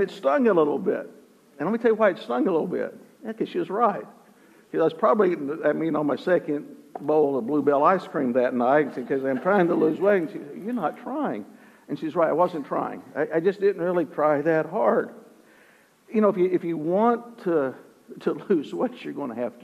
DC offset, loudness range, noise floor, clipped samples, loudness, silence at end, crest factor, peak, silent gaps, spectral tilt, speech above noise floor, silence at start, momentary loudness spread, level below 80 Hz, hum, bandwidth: under 0.1%; 3 LU; -57 dBFS; under 0.1%; -24 LUFS; 0.05 s; 18 dB; -6 dBFS; none; -8 dB/octave; 33 dB; 0 s; 11 LU; -78 dBFS; none; 13.5 kHz